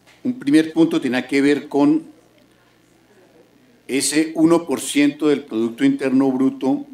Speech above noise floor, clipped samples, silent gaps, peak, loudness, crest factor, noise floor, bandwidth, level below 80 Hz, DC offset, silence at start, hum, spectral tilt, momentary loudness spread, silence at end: 37 dB; under 0.1%; none; -4 dBFS; -18 LUFS; 16 dB; -55 dBFS; 15.5 kHz; -68 dBFS; under 0.1%; 0.25 s; none; -4.5 dB/octave; 6 LU; 0.1 s